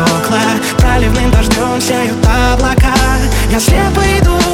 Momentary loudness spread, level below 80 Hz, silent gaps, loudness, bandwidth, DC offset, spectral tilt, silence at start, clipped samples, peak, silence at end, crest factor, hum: 2 LU; -14 dBFS; none; -11 LUFS; 17 kHz; under 0.1%; -5 dB/octave; 0 s; under 0.1%; 0 dBFS; 0 s; 10 dB; none